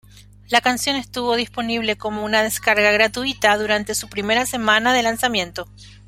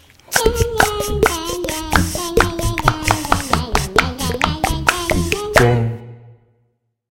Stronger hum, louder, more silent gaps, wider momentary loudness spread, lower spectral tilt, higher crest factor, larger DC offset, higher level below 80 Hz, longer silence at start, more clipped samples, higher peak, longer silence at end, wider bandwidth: first, 50 Hz at -40 dBFS vs none; about the same, -19 LUFS vs -17 LUFS; neither; first, 8 LU vs 5 LU; second, -2.5 dB/octave vs -4 dB/octave; about the same, 20 dB vs 18 dB; second, under 0.1% vs 0.2%; second, -48 dBFS vs -28 dBFS; second, 0.15 s vs 0.3 s; neither; about the same, -2 dBFS vs 0 dBFS; second, 0.15 s vs 0.75 s; about the same, 16.5 kHz vs 17.5 kHz